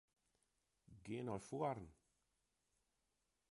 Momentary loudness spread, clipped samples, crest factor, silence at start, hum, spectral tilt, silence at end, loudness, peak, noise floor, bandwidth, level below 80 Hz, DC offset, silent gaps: 16 LU; under 0.1%; 24 dB; 0.9 s; none; -6.5 dB/octave; 1.55 s; -47 LUFS; -28 dBFS; -88 dBFS; 11.5 kHz; -76 dBFS; under 0.1%; none